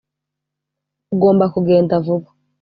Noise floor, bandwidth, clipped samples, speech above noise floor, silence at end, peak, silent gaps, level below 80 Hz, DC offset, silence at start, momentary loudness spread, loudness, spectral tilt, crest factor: -81 dBFS; 5 kHz; under 0.1%; 66 dB; 0.4 s; -2 dBFS; none; -56 dBFS; under 0.1%; 1.1 s; 9 LU; -16 LUFS; -8.5 dB/octave; 14 dB